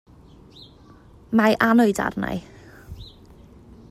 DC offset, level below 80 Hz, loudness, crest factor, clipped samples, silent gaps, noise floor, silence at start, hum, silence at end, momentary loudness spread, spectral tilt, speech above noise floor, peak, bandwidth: under 0.1%; -50 dBFS; -20 LUFS; 22 dB; under 0.1%; none; -49 dBFS; 1.3 s; none; 0.8 s; 25 LU; -5.5 dB/octave; 29 dB; -2 dBFS; 15 kHz